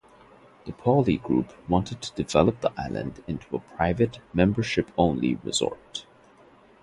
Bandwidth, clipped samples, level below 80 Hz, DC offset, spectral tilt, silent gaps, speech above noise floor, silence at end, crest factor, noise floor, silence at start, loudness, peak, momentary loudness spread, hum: 11.5 kHz; under 0.1%; -46 dBFS; under 0.1%; -6 dB/octave; none; 29 dB; 0.8 s; 22 dB; -55 dBFS; 0.65 s; -26 LUFS; -4 dBFS; 13 LU; none